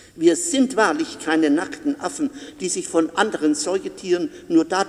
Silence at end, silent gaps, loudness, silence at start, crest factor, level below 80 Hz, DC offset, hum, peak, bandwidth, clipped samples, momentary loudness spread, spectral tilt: 0 s; none; -21 LUFS; 0.15 s; 18 dB; -62 dBFS; under 0.1%; none; -2 dBFS; 13 kHz; under 0.1%; 8 LU; -3 dB/octave